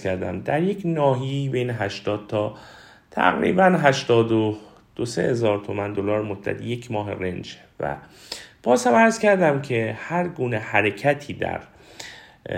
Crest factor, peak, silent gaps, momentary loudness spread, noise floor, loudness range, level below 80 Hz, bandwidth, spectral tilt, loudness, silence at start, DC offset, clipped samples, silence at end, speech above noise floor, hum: 22 dB; -2 dBFS; none; 18 LU; -42 dBFS; 5 LU; -56 dBFS; 16 kHz; -6 dB/octave; -22 LUFS; 0 s; under 0.1%; under 0.1%; 0 s; 20 dB; none